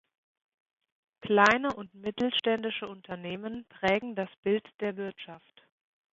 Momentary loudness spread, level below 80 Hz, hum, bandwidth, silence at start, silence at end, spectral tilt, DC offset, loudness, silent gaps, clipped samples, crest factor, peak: 17 LU; -68 dBFS; none; 7.8 kHz; 1.25 s; 0.75 s; -5 dB/octave; under 0.1%; -30 LUFS; 4.38-4.43 s, 4.74-4.79 s; under 0.1%; 24 dB; -6 dBFS